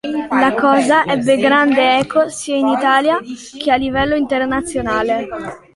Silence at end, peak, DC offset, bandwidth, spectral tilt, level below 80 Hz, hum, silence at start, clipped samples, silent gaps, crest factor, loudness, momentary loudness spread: 0.2 s; 0 dBFS; under 0.1%; 11.5 kHz; -4 dB/octave; -44 dBFS; none; 0.05 s; under 0.1%; none; 14 dB; -15 LUFS; 8 LU